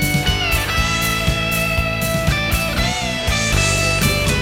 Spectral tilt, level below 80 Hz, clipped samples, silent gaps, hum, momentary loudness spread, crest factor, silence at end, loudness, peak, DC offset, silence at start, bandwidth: -3.5 dB/octave; -26 dBFS; under 0.1%; none; none; 3 LU; 14 dB; 0 s; -17 LUFS; -2 dBFS; under 0.1%; 0 s; 17.5 kHz